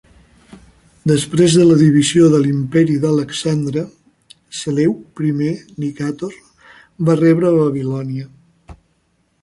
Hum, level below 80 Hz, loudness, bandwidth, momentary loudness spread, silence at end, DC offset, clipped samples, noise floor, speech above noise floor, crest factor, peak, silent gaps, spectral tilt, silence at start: none; -52 dBFS; -15 LUFS; 11.5 kHz; 15 LU; 0.7 s; under 0.1%; under 0.1%; -62 dBFS; 48 dB; 14 dB; -2 dBFS; none; -6.5 dB/octave; 1.05 s